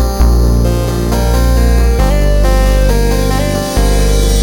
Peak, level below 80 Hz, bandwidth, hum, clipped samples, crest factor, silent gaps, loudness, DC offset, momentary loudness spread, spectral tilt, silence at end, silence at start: 0 dBFS; -10 dBFS; 18 kHz; none; under 0.1%; 10 dB; none; -12 LUFS; under 0.1%; 3 LU; -5.5 dB/octave; 0 s; 0 s